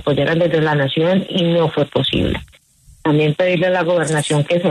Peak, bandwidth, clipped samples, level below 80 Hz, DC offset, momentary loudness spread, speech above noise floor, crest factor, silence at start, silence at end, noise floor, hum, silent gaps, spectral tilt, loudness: -4 dBFS; 12.5 kHz; under 0.1%; -40 dBFS; under 0.1%; 3 LU; 32 dB; 12 dB; 0 s; 0 s; -48 dBFS; none; none; -5.5 dB/octave; -16 LUFS